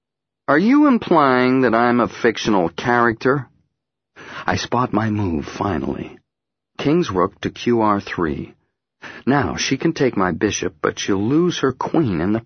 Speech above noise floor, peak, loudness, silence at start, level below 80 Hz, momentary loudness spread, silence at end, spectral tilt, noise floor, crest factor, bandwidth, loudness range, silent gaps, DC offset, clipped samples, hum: 65 dB; 0 dBFS; -18 LUFS; 0.5 s; -46 dBFS; 10 LU; 0.05 s; -5.5 dB/octave; -83 dBFS; 18 dB; 6.6 kHz; 6 LU; none; under 0.1%; under 0.1%; none